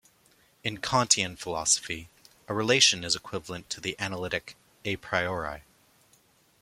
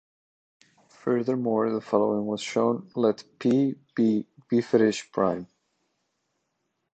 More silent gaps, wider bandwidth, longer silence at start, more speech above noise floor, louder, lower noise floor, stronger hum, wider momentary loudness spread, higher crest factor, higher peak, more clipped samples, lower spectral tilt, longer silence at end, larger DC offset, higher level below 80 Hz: neither; first, 16.5 kHz vs 8.8 kHz; second, 0.65 s vs 1.05 s; second, 35 dB vs 53 dB; about the same, -27 LUFS vs -26 LUFS; second, -64 dBFS vs -78 dBFS; neither; first, 16 LU vs 5 LU; first, 26 dB vs 20 dB; about the same, -4 dBFS vs -6 dBFS; neither; second, -2 dB/octave vs -6.5 dB/octave; second, 1 s vs 1.5 s; neither; first, -60 dBFS vs -70 dBFS